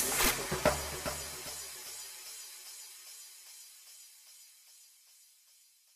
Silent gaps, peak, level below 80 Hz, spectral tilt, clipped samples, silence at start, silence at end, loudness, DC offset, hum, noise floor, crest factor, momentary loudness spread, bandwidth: none; -12 dBFS; -54 dBFS; -2 dB/octave; under 0.1%; 0 s; 0.7 s; -35 LUFS; under 0.1%; none; -64 dBFS; 26 dB; 24 LU; 15.5 kHz